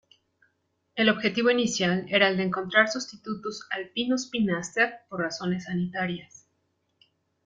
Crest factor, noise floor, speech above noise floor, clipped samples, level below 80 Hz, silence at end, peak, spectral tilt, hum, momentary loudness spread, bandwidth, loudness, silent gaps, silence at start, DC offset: 22 dB; -74 dBFS; 48 dB; under 0.1%; -66 dBFS; 1.2 s; -6 dBFS; -4 dB/octave; none; 11 LU; 9.4 kHz; -26 LUFS; none; 0.95 s; under 0.1%